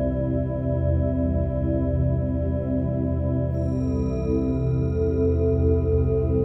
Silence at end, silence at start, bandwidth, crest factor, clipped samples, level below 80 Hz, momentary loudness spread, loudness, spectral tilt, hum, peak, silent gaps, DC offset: 0 s; 0 s; 6 kHz; 12 dB; under 0.1%; -30 dBFS; 4 LU; -24 LUFS; -12 dB/octave; none; -10 dBFS; none; under 0.1%